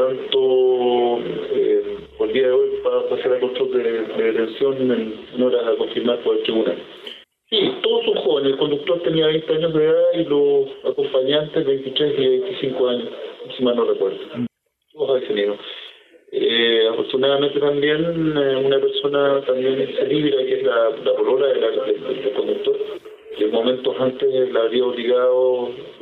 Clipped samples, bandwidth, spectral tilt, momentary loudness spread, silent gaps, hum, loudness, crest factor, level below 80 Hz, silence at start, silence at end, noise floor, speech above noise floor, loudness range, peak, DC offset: under 0.1%; 4.4 kHz; -7.5 dB/octave; 8 LU; none; none; -19 LUFS; 14 dB; -62 dBFS; 0 s; 0.05 s; -56 dBFS; 37 dB; 3 LU; -4 dBFS; under 0.1%